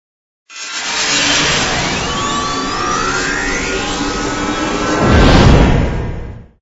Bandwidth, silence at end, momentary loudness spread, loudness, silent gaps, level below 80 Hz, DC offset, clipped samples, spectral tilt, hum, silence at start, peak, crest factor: 8 kHz; 0.15 s; 14 LU; -14 LUFS; none; -22 dBFS; under 0.1%; 0.1%; -4 dB/octave; none; 0.5 s; 0 dBFS; 14 dB